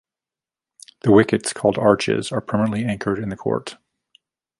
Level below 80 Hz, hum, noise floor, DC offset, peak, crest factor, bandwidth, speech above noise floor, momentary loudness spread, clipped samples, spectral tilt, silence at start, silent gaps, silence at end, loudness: -52 dBFS; none; -90 dBFS; under 0.1%; -2 dBFS; 20 dB; 11.5 kHz; 71 dB; 10 LU; under 0.1%; -6 dB/octave; 1.05 s; none; 0.85 s; -20 LUFS